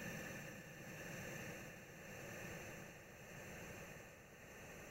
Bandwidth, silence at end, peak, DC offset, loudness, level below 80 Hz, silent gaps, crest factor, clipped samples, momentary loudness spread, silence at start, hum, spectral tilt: 16 kHz; 0 s; -38 dBFS; under 0.1%; -53 LUFS; -70 dBFS; none; 16 dB; under 0.1%; 7 LU; 0 s; none; -4 dB/octave